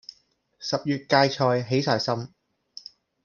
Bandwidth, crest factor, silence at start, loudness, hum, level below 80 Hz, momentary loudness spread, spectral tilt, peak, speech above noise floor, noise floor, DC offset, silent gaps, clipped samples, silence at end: 7.2 kHz; 22 dB; 0.6 s; -24 LUFS; none; -68 dBFS; 22 LU; -5.5 dB/octave; -4 dBFS; 40 dB; -63 dBFS; under 0.1%; none; under 0.1%; 1 s